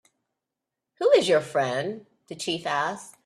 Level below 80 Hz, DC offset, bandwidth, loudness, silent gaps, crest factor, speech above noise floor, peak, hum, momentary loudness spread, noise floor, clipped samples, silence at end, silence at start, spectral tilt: -72 dBFS; under 0.1%; 13 kHz; -25 LUFS; none; 20 dB; 59 dB; -6 dBFS; none; 14 LU; -86 dBFS; under 0.1%; 0.15 s; 1 s; -4 dB/octave